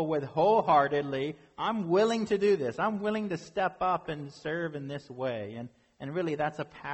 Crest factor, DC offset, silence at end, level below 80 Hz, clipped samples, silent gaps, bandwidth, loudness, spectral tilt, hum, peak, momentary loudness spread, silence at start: 18 dB; under 0.1%; 0 s; -66 dBFS; under 0.1%; none; 8.4 kHz; -30 LUFS; -6.5 dB/octave; none; -10 dBFS; 14 LU; 0 s